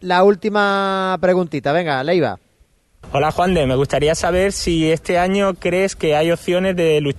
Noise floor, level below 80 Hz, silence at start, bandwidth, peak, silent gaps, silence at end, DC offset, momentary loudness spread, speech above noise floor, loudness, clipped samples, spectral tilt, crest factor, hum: -56 dBFS; -38 dBFS; 0 s; 12.5 kHz; -2 dBFS; none; 0 s; under 0.1%; 3 LU; 40 dB; -17 LUFS; under 0.1%; -5.5 dB/octave; 16 dB; none